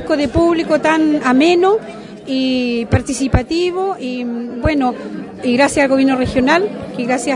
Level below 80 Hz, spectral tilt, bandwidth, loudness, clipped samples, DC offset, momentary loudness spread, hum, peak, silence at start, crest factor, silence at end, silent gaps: -34 dBFS; -5.5 dB/octave; 11 kHz; -15 LUFS; under 0.1%; under 0.1%; 10 LU; none; 0 dBFS; 0 s; 14 dB; 0 s; none